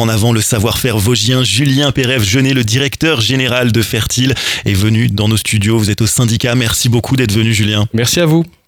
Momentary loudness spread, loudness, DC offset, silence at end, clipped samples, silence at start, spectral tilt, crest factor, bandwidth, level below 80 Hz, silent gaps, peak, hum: 2 LU; -12 LUFS; under 0.1%; 0.2 s; under 0.1%; 0 s; -4.5 dB/octave; 12 dB; 19 kHz; -36 dBFS; none; 0 dBFS; none